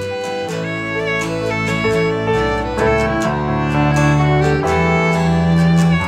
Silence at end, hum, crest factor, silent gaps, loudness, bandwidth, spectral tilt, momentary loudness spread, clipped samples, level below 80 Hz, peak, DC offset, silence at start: 0 s; none; 12 dB; none; -16 LUFS; 12 kHz; -6.5 dB/octave; 7 LU; under 0.1%; -32 dBFS; -4 dBFS; under 0.1%; 0 s